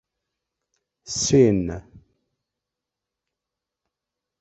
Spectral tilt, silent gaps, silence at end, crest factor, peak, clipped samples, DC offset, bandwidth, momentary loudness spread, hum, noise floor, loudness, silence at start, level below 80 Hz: -5 dB/octave; none; 2.4 s; 22 dB; -4 dBFS; under 0.1%; under 0.1%; 8.2 kHz; 15 LU; none; -86 dBFS; -20 LUFS; 1.05 s; -50 dBFS